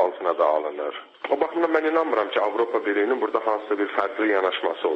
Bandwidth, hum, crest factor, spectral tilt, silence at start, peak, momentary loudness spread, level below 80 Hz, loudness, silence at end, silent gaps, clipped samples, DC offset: 7.6 kHz; none; 16 dB; -5 dB/octave; 0 s; -6 dBFS; 5 LU; -78 dBFS; -23 LUFS; 0 s; none; under 0.1%; under 0.1%